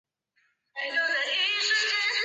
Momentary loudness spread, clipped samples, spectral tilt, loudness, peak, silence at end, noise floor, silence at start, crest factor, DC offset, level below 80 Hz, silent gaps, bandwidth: 9 LU; under 0.1%; 3.5 dB/octave; -25 LUFS; -14 dBFS; 0 s; -72 dBFS; 0.75 s; 14 dB; under 0.1%; under -90 dBFS; none; 8.4 kHz